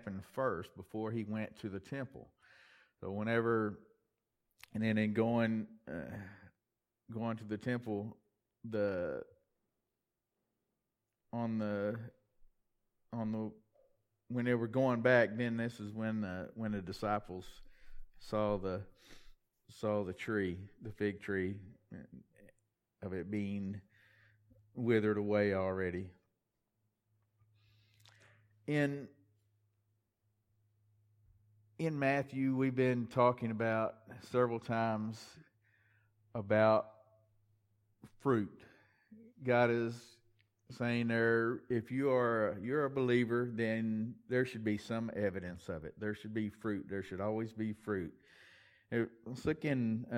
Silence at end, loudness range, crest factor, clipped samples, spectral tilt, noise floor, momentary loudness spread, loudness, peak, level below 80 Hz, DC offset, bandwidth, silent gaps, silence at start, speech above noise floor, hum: 0 s; 9 LU; 22 dB; under 0.1%; -7.5 dB/octave; -89 dBFS; 15 LU; -36 LUFS; -16 dBFS; -68 dBFS; under 0.1%; 13.5 kHz; none; 0 s; 53 dB; none